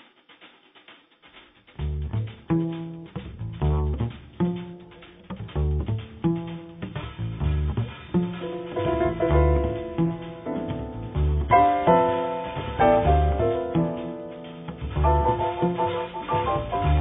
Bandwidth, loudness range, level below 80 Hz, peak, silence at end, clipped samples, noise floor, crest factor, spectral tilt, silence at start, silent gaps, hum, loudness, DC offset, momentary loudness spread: 3.9 kHz; 8 LU; -32 dBFS; -6 dBFS; 0 s; under 0.1%; -53 dBFS; 18 dB; -7 dB/octave; 0.4 s; none; none; -25 LUFS; under 0.1%; 16 LU